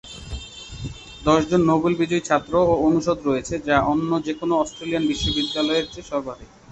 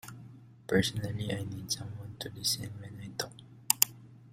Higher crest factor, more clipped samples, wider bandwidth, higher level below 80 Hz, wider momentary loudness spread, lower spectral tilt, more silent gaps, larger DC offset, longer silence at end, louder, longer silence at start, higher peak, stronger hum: second, 20 dB vs 32 dB; neither; second, 8.2 kHz vs 16 kHz; first, -42 dBFS vs -60 dBFS; second, 17 LU vs 22 LU; first, -5.5 dB/octave vs -3 dB/octave; neither; neither; first, 0.25 s vs 0 s; first, -21 LUFS vs -32 LUFS; about the same, 0.05 s vs 0.05 s; about the same, -2 dBFS vs -2 dBFS; neither